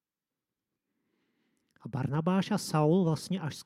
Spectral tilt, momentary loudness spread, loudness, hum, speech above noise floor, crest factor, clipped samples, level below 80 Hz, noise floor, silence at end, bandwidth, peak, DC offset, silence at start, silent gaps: -6.5 dB/octave; 11 LU; -29 LUFS; none; over 61 dB; 18 dB; under 0.1%; -70 dBFS; under -90 dBFS; 0 s; 14.5 kHz; -14 dBFS; under 0.1%; 1.85 s; none